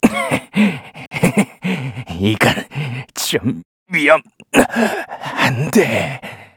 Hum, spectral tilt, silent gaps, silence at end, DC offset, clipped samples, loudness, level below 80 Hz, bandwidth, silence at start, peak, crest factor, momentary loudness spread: none; -5 dB/octave; 1.07-1.11 s, 3.65-3.86 s; 0.1 s; under 0.1%; under 0.1%; -17 LUFS; -48 dBFS; over 20 kHz; 0.05 s; 0 dBFS; 18 dB; 11 LU